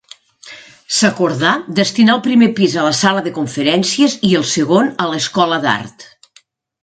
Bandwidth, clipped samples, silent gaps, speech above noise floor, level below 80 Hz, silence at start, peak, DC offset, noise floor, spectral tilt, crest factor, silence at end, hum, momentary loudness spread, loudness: 9.4 kHz; under 0.1%; none; 38 dB; -58 dBFS; 0.45 s; 0 dBFS; under 0.1%; -52 dBFS; -4 dB/octave; 14 dB; 0.8 s; none; 7 LU; -14 LUFS